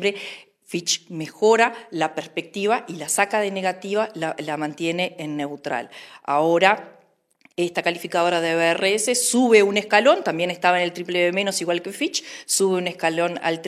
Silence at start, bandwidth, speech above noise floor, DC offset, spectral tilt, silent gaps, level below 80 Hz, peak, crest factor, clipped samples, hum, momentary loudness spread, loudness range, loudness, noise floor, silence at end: 0 s; 15.5 kHz; 37 dB; under 0.1%; -3 dB/octave; none; -76 dBFS; 0 dBFS; 22 dB; under 0.1%; none; 12 LU; 6 LU; -21 LUFS; -59 dBFS; 0 s